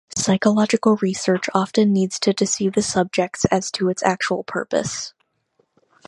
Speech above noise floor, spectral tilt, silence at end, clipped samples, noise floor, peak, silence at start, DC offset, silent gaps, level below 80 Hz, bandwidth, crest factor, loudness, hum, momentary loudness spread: 47 dB; -4.5 dB/octave; 1 s; under 0.1%; -66 dBFS; 0 dBFS; 0.1 s; under 0.1%; none; -54 dBFS; 11.5 kHz; 20 dB; -20 LUFS; none; 6 LU